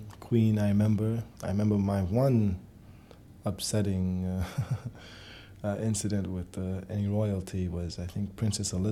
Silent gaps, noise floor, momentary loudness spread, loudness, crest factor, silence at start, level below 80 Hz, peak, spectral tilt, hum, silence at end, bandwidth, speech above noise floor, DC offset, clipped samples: none; -52 dBFS; 11 LU; -30 LUFS; 16 dB; 0 s; -52 dBFS; -14 dBFS; -6.5 dB/octave; none; 0 s; 14 kHz; 23 dB; under 0.1%; under 0.1%